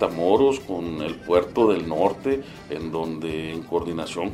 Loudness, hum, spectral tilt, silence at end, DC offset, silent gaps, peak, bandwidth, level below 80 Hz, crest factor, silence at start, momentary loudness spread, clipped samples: -24 LUFS; none; -6 dB/octave; 0 s; under 0.1%; none; -4 dBFS; 13.5 kHz; -50 dBFS; 18 dB; 0 s; 11 LU; under 0.1%